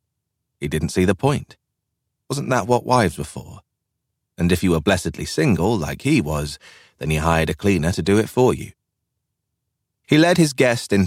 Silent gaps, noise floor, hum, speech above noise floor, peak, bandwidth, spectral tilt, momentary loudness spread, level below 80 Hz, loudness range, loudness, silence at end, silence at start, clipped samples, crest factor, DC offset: none; -78 dBFS; none; 59 dB; -4 dBFS; 16.5 kHz; -5.5 dB/octave; 13 LU; -40 dBFS; 3 LU; -19 LUFS; 0 s; 0.6 s; under 0.1%; 18 dB; under 0.1%